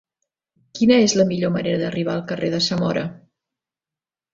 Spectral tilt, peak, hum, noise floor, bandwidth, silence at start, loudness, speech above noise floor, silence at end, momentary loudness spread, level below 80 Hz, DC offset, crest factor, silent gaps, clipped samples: -5 dB/octave; -2 dBFS; none; under -90 dBFS; 7.8 kHz; 0.75 s; -20 LUFS; over 71 dB; 1.2 s; 10 LU; -58 dBFS; under 0.1%; 20 dB; none; under 0.1%